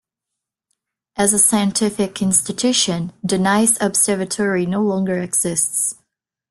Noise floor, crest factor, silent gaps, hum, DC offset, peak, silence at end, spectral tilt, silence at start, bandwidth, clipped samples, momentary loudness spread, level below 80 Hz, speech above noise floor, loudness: -83 dBFS; 20 dB; none; none; under 0.1%; 0 dBFS; 0.55 s; -3 dB/octave; 1.15 s; 12.5 kHz; under 0.1%; 7 LU; -56 dBFS; 65 dB; -17 LUFS